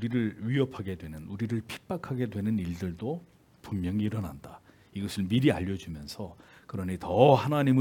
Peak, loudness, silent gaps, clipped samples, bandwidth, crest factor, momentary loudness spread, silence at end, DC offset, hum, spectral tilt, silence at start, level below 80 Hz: -6 dBFS; -30 LUFS; none; under 0.1%; 18 kHz; 24 dB; 17 LU; 0 s; under 0.1%; none; -7.5 dB/octave; 0 s; -60 dBFS